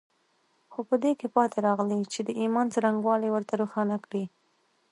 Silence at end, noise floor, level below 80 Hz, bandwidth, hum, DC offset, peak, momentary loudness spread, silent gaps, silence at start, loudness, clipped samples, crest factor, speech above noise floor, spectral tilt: 0.65 s; -70 dBFS; -80 dBFS; 11 kHz; none; under 0.1%; -8 dBFS; 9 LU; none; 0.7 s; -27 LUFS; under 0.1%; 20 dB; 43 dB; -6 dB/octave